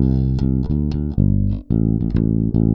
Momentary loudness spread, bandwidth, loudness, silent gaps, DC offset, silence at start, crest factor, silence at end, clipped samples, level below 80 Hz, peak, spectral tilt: 3 LU; 5.6 kHz; -19 LUFS; none; under 0.1%; 0 s; 14 dB; 0 s; under 0.1%; -24 dBFS; -4 dBFS; -11.5 dB/octave